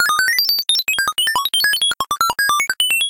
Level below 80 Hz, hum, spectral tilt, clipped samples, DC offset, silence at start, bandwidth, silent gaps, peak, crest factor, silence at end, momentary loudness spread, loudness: -56 dBFS; none; 2.5 dB/octave; under 0.1%; under 0.1%; 0 s; 17.5 kHz; none; -6 dBFS; 12 dB; 0 s; 3 LU; -15 LUFS